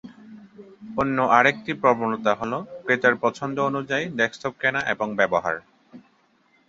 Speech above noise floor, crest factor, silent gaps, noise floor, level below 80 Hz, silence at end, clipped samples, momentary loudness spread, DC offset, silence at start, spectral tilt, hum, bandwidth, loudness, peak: 40 dB; 22 dB; none; -62 dBFS; -60 dBFS; 0.7 s; under 0.1%; 9 LU; under 0.1%; 0.05 s; -5 dB/octave; none; 7.8 kHz; -23 LUFS; -2 dBFS